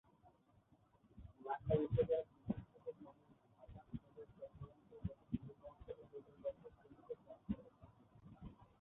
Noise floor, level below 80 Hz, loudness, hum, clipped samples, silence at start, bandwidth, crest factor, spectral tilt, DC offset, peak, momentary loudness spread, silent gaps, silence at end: -73 dBFS; -64 dBFS; -46 LUFS; none; under 0.1%; 0.25 s; 3.9 kHz; 24 dB; -7.5 dB/octave; under 0.1%; -24 dBFS; 24 LU; none; 0.15 s